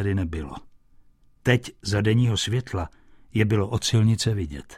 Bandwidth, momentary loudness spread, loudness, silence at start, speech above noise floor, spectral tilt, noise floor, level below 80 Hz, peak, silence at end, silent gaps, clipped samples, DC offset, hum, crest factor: 13.5 kHz; 12 LU; -24 LUFS; 0 s; 31 dB; -5.5 dB/octave; -54 dBFS; -44 dBFS; -8 dBFS; 0 s; none; under 0.1%; under 0.1%; none; 16 dB